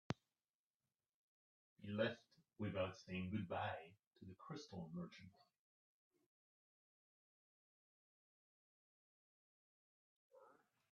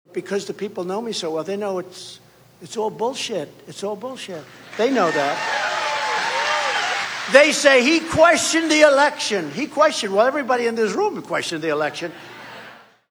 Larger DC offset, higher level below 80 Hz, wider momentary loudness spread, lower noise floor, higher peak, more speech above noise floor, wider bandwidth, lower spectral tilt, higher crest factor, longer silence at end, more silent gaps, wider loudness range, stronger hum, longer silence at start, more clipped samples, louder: neither; second, -86 dBFS vs -60 dBFS; about the same, 19 LU vs 19 LU; first, under -90 dBFS vs -44 dBFS; second, -22 dBFS vs 0 dBFS; first, over 42 dB vs 24 dB; second, 7.6 kHz vs over 20 kHz; first, -6.5 dB/octave vs -2.5 dB/octave; first, 30 dB vs 20 dB; about the same, 0.4 s vs 0.35 s; first, 0.50-0.80 s, 0.95-0.99 s, 1.14-1.76 s, 4.07-4.11 s, 5.59-6.11 s, 6.26-10.30 s vs none; about the same, 11 LU vs 11 LU; neither; about the same, 0.1 s vs 0.15 s; neither; second, -48 LUFS vs -19 LUFS